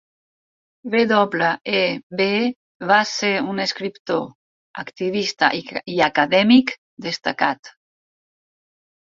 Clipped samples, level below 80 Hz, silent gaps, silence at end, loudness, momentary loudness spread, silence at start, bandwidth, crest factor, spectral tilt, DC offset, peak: under 0.1%; -64 dBFS; 2.03-2.10 s, 2.56-2.80 s, 4.00-4.05 s, 4.35-4.74 s, 6.78-6.97 s, 7.59-7.63 s; 1.45 s; -19 LUFS; 15 LU; 0.85 s; 7.6 kHz; 20 dB; -4.5 dB/octave; under 0.1%; 0 dBFS